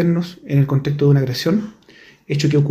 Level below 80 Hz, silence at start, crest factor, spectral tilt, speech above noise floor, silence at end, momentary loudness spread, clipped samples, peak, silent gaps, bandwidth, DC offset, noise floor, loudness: -52 dBFS; 0 s; 14 dB; -7.5 dB/octave; 31 dB; 0 s; 7 LU; under 0.1%; -4 dBFS; none; 14 kHz; under 0.1%; -47 dBFS; -18 LUFS